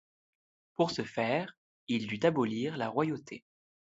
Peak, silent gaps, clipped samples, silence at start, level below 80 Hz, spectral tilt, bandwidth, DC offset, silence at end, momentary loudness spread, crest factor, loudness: -14 dBFS; 1.57-1.87 s; under 0.1%; 0.8 s; -74 dBFS; -6 dB/octave; 8 kHz; under 0.1%; 0.6 s; 17 LU; 20 dB; -32 LUFS